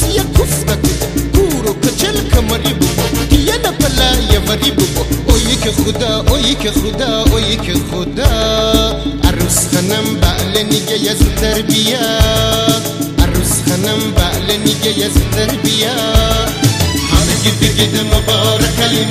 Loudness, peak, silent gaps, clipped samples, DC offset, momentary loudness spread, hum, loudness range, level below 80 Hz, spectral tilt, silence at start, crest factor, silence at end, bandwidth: -13 LUFS; 0 dBFS; none; 0.3%; under 0.1%; 3 LU; none; 1 LU; -18 dBFS; -4 dB/octave; 0 s; 12 dB; 0 s; 15.5 kHz